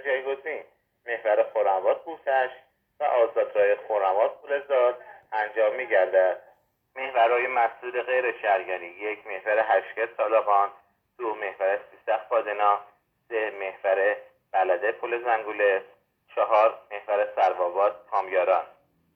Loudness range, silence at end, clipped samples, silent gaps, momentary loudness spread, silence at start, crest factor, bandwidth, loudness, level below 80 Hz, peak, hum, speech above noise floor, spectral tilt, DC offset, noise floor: 2 LU; 0.45 s; under 0.1%; none; 11 LU; 0 s; 18 dB; 4.9 kHz; -25 LUFS; -78 dBFS; -8 dBFS; none; 33 dB; -5 dB/octave; under 0.1%; -57 dBFS